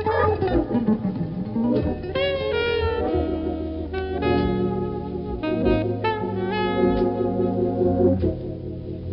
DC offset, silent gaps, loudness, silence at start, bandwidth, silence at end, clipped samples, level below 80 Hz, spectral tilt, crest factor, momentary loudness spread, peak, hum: under 0.1%; none; -23 LUFS; 0 s; 5.6 kHz; 0 s; under 0.1%; -36 dBFS; -6 dB/octave; 16 dB; 8 LU; -6 dBFS; none